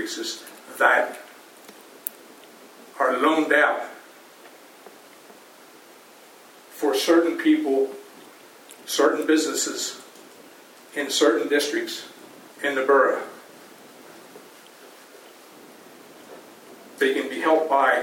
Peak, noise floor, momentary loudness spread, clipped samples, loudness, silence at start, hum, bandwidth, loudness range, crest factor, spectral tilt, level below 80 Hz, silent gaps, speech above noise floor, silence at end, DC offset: -2 dBFS; -49 dBFS; 26 LU; under 0.1%; -22 LUFS; 0 s; none; 17.5 kHz; 8 LU; 24 dB; -1.5 dB/octave; -88 dBFS; none; 28 dB; 0 s; under 0.1%